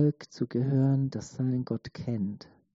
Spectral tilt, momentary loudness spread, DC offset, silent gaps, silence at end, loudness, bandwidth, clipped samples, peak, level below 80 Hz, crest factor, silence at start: -9.5 dB/octave; 10 LU; under 0.1%; none; 0.4 s; -30 LUFS; 7.6 kHz; under 0.1%; -14 dBFS; -64 dBFS; 14 dB; 0 s